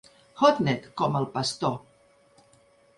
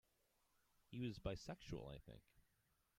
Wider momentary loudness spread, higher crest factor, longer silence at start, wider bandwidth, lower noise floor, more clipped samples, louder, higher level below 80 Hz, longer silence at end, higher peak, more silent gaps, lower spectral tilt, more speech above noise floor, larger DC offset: second, 9 LU vs 14 LU; about the same, 22 dB vs 22 dB; second, 0.35 s vs 0.9 s; second, 11.5 kHz vs 16 kHz; second, -60 dBFS vs -83 dBFS; neither; first, -26 LUFS vs -52 LUFS; about the same, -64 dBFS vs -66 dBFS; first, 1.2 s vs 0.6 s; first, -6 dBFS vs -32 dBFS; neither; about the same, -5.5 dB/octave vs -6.5 dB/octave; about the same, 35 dB vs 32 dB; neither